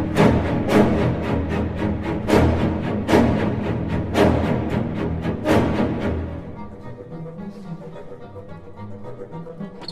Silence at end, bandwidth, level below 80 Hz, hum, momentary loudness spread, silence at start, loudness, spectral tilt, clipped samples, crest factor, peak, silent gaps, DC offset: 0 s; 15 kHz; -34 dBFS; none; 20 LU; 0 s; -20 LUFS; -7.5 dB/octave; under 0.1%; 20 dB; -2 dBFS; none; under 0.1%